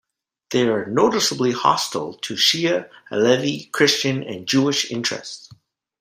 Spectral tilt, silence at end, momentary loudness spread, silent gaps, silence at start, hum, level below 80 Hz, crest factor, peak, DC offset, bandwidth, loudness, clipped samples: -3.5 dB/octave; 0.45 s; 10 LU; none; 0.5 s; none; -64 dBFS; 18 dB; -2 dBFS; under 0.1%; 16 kHz; -20 LUFS; under 0.1%